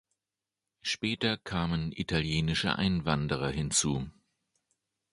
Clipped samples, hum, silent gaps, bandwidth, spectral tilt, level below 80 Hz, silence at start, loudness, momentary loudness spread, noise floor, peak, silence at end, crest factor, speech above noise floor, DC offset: under 0.1%; none; none; 11.5 kHz; -4 dB/octave; -48 dBFS; 0.85 s; -30 LUFS; 6 LU; under -90 dBFS; -12 dBFS; 1 s; 22 dB; over 60 dB; under 0.1%